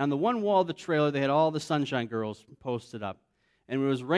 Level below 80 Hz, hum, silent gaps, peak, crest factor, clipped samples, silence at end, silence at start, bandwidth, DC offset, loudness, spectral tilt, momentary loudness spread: -72 dBFS; none; none; -12 dBFS; 16 dB; under 0.1%; 0 s; 0 s; 11 kHz; under 0.1%; -29 LUFS; -6.5 dB/octave; 13 LU